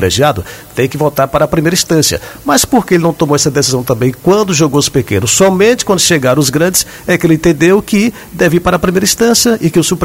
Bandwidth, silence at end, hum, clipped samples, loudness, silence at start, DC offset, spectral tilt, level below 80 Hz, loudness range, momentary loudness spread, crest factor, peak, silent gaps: 16.5 kHz; 0 s; none; under 0.1%; -10 LUFS; 0 s; under 0.1%; -4 dB/octave; -36 dBFS; 1 LU; 5 LU; 10 dB; 0 dBFS; none